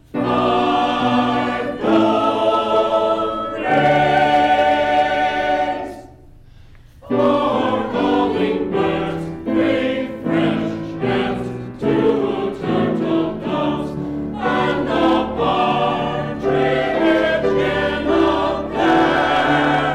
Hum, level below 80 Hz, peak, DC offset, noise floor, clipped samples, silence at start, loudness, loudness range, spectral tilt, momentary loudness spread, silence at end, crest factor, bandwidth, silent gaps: none; -42 dBFS; -6 dBFS; under 0.1%; -43 dBFS; under 0.1%; 0.15 s; -18 LUFS; 4 LU; -6.5 dB/octave; 8 LU; 0 s; 10 dB; 11 kHz; none